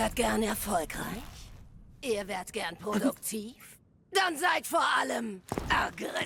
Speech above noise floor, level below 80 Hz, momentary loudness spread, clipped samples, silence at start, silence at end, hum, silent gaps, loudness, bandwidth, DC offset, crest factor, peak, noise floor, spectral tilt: 20 dB; -50 dBFS; 12 LU; under 0.1%; 0 s; 0 s; none; none; -31 LUFS; 18 kHz; under 0.1%; 18 dB; -14 dBFS; -51 dBFS; -3 dB/octave